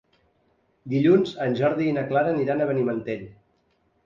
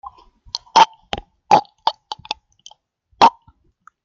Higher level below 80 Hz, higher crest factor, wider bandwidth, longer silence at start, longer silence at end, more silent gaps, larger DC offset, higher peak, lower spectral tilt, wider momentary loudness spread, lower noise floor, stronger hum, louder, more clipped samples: second, -62 dBFS vs -52 dBFS; about the same, 18 dB vs 20 dB; about the same, 7.4 kHz vs 7.6 kHz; first, 0.85 s vs 0.55 s; about the same, 0.75 s vs 0.75 s; neither; neither; second, -6 dBFS vs 0 dBFS; first, -8.5 dB/octave vs -2.5 dB/octave; second, 10 LU vs 16 LU; first, -67 dBFS vs -56 dBFS; neither; second, -23 LUFS vs -17 LUFS; neither